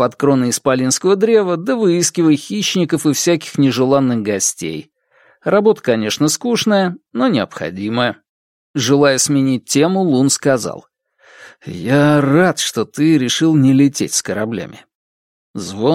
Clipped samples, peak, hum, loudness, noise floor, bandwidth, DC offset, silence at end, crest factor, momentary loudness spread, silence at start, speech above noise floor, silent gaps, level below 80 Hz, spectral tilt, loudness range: under 0.1%; 0 dBFS; none; -15 LUFS; -54 dBFS; 16.5 kHz; under 0.1%; 0 s; 14 dB; 13 LU; 0 s; 39 dB; 8.29-8.74 s, 14.95-15.54 s; -58 dBFS; -4.5 dB/octave; 2 LU